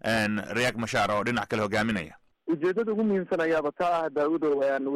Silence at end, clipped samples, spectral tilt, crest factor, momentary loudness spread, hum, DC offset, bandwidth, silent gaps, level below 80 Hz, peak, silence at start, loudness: 0 s; under 0.1%; -5.5 dB/octave; 10 dB; 3 LU; none; under 0.1%; 15 kHz; none; -58 dBFS; -16 dBFS; 0.05 s; -27 LUFS